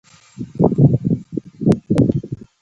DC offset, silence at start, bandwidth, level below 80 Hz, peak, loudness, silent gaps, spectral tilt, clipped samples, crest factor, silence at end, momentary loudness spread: under 0.1%; 0.4 s; 10.5 kHz; -42 dBFS; 0 dBFS; -17 LUFS; none; -10 dB/octave; under 0.1%; 18 dB; 0.25 s; 18 LU